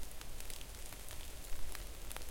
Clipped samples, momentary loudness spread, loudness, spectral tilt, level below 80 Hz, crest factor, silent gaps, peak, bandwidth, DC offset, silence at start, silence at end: under 0.1%; 1 LU; -49 LUFS; -2.5 dB/octave; -48 dBFS; 18 dB; none; -22 dBFS; 17 kHz; under 0.1%; 0 s; 0 s